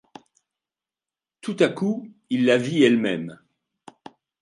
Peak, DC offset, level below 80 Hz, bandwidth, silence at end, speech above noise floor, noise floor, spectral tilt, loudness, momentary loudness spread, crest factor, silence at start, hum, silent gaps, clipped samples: -4 dBFS; under 0.1%; -72 dBFS; 11 kHz; 1.05 s; over 69 dB; under -90 dBFS; -6 dB/octave; -22 LUFS; 15 LU; 20 dB; 1.45 s; none; none; under 0.1%